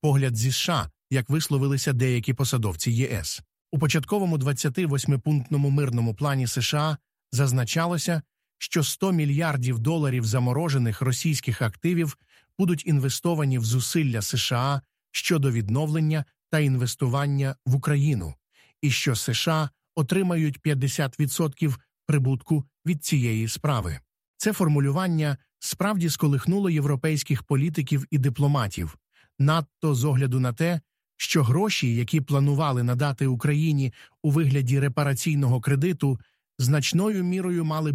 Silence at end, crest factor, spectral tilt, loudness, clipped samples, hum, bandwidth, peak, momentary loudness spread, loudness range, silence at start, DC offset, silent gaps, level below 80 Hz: 0 s; 14 dB; -5.5 dB/octave; -25 LUFS; under 0.1%; none; 15.5 kHz; -10 dBFS; 6 LU; 2 LU; 0.05 s; under 0.1%; 24.28-24.34 s; -54 dBFS